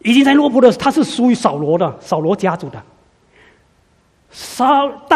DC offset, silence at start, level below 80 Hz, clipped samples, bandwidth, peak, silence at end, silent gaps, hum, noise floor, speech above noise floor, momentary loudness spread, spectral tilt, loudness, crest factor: under 0.1%; 0.05 s; -54 dBFS; under 0.1%; 14.5 kHz; 0 dBFS; 0 s; none; none; -55 dBFS; 42 dB; 14 LU; -5.5 dB/octave; -14 LUFS; 16 dB